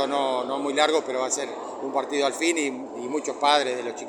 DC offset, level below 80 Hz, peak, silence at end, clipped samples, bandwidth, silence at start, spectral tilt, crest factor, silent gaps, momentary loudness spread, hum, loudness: under 0.1%; -78 dBFS; -4 dBFS; 0 s; under 0.1%; 17 kHz; 0 s; -1.5 dB/octave; 22 dB; none; 9 LU; none; -25 LUFS